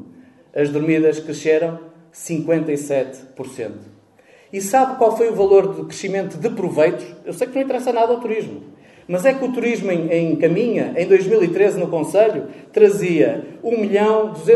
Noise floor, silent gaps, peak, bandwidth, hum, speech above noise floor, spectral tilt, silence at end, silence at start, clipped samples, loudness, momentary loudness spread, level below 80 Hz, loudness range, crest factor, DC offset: -50 dBFS; none; 0 dBFS; 12 kHz; none; 33 dB; -6 dB/octave; 0 s; 0 s; under 0.1%; -18 LUFS; 15 LU; -64 dBFS; 5 LU; 18 dB; under 0.1%